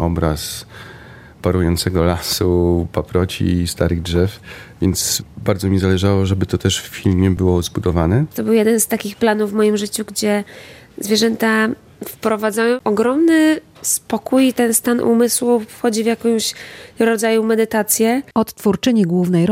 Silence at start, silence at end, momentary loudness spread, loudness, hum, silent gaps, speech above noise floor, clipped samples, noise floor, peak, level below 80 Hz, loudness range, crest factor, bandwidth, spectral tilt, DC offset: 0 s; 0 s; 7 LU; -17 LUFS; none; none; 23 dB; under 0.1%; -39 dBFS; 0 dBFS; -42 dBFS; 3 LU; 16 dB; 16.5 kHz; -5 dB/octave; under 0.1%